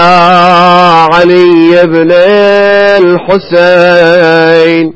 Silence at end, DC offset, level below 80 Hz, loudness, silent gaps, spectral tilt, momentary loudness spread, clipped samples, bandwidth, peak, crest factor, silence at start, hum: 0.05 s; under 0.1%; -44 dBFS; -4 LUFS; none; -6.5 dB/octave; 3 LU; 8%; 8 kHz; 0 dBFS; 4 dB; 0 s; none